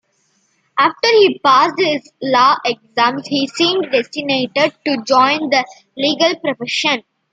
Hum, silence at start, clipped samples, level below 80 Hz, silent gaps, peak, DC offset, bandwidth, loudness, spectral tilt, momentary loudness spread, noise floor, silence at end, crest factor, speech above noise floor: none; 0.75 s; under 0.1%; -68 dBFS; none; 0 dBFS; under 0.1%; 9.4 kHz; -15 LUFS; -3.5 dB/octave; 8 LU; -62 dBFS; 0.35 s; 16 dB; 47 dB